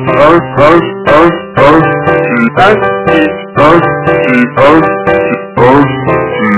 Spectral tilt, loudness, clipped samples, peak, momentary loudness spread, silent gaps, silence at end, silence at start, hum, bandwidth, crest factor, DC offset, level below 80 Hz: -10.5 dB/octave; -7 LUFS; 8%; 0 dBFS; 4 LU; none; 0 s; 0 s; none; 4 kHz; 6 dB; under 0.1%; -34 dBFS